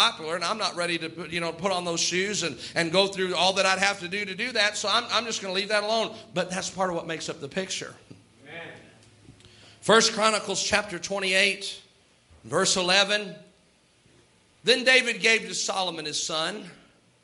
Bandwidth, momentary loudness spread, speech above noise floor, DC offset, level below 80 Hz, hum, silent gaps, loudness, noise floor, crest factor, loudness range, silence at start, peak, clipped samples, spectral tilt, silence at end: 12 kHz; 13 LU; 36 dB; under 0.1%; -66 dBFS; none; none; -24 LUFS; -62 dBFS; 24 dB; 6 LU; 0 s; -4 dBFS; under 0.1%; -2 dB/octave; 0.5 s